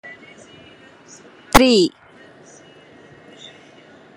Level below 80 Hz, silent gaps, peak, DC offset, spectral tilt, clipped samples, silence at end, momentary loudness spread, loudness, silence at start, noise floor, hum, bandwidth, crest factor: -38 dBFS; none; 0 dBFS; under 0.1%; -3.5 dB/octave; under 0.1%; 2.3 s; 28 LU; -15 LUFS; 0.05 s; -46 dBFS; none; 13 kHz; 22 dB